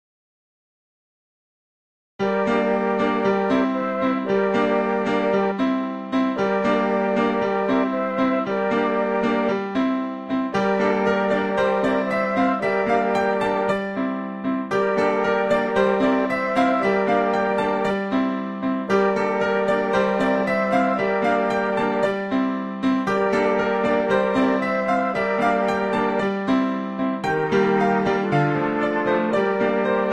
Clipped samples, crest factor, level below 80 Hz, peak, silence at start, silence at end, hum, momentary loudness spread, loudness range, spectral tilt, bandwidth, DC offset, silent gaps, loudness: under 0.1%; 14 dB; -56 dBFS; -6 dBFS; 2.2 s; 0 s; none; 4 LU; 1 LU; -7 dB/octave; 10.5 kHz; 0.1%; none; -21 LUFS